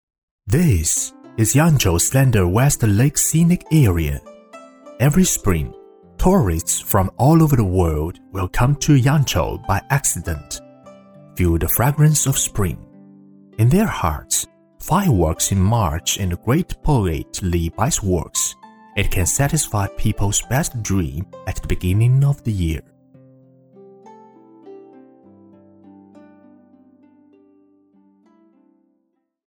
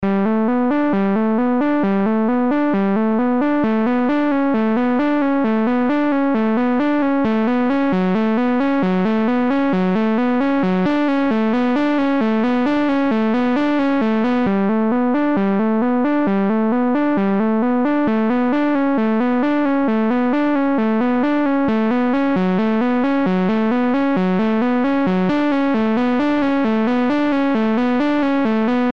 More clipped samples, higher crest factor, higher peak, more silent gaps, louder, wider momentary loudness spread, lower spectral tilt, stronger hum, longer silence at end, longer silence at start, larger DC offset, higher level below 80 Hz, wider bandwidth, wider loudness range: neither; first, 16 dB vs 10 dB; first, -2 dBFS vs -6 dBFS; neither; about the same, -18 LUFS vs -17 LUFS; first, 11 LU vs 0 LU; second, -5 dB/octave vs -8.5 dB/octave; neither; first, 4.7 s vs 0 s; first, 0.45 s vs 0 s; second, under 0.1% vs 2%; first, -32 dBFS vs -52 dBFS; first, over 20 kHz vs 6.4 kHz; first, 5 LU vs 0 LU